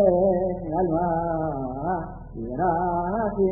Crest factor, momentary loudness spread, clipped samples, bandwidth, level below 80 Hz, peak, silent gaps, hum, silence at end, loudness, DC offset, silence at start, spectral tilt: 18 dB; 9 LU; under 0.1%; 2.1 kHz; -42 dBFS; -6 dBFS; none; none; 0 s; -25 LUFS; under 0.1%; 0 s; -15.5 dB/octave